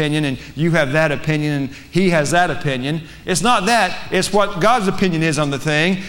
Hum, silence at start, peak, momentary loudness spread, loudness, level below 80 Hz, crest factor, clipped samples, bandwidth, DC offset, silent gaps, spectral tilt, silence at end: none; 0 s; -4 dBFS; 7 LU; -17 LUFS; -40 dBFS; 14 dB; under 0.1%; 16.5 kHz; under 0.1%; none; -5 dB/octave; 0 s